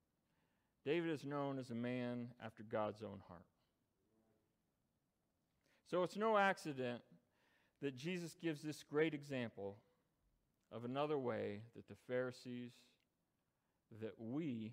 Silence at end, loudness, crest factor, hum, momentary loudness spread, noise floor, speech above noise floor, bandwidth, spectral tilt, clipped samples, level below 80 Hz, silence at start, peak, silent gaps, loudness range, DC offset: 0 s; -44 LUFS; 22 dB; none; 14 LU; -87 dBFS; 43 dB; 15.5 kHz; -6 dB/octave; under 0.1%; -88 dBFS; 0.85 s; -24 dBFS; none; 8 LU; under 0.1%